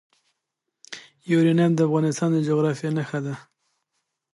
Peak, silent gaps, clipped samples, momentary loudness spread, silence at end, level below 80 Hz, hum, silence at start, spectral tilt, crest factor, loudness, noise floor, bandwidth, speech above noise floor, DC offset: -8 dBFS; none; under 0.1%; 20 LU; 0.95 s; -72 dBFS; none; 0.9 s; -7 dB/octave; 16 dB; -22 LUFS; -81 dBFS; 11.5 kHz; 60 dB; under 0.1%